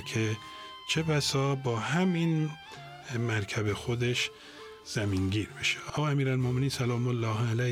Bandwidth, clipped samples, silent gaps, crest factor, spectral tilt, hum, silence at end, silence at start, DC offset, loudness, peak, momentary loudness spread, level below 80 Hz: 15.5 kHz; under 0.1%; none; 14 dB; -5 dB/octave; none; 0 s; 0 s; under 0.1%; -30 LUFS; -16 dBFS; 13 LU; -60 dBFS